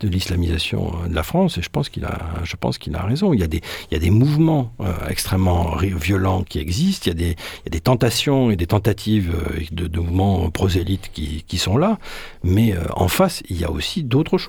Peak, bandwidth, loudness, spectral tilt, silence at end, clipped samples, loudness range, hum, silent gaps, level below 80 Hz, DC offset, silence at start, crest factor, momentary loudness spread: -2 dBFS; 19 kHz; -20 LUFS; -6 dB/octave; 0 s; under 0.1%; 2 LU; none; none; -32 dBFS; under 0.1%; 0 s; 18 dB; 8 LU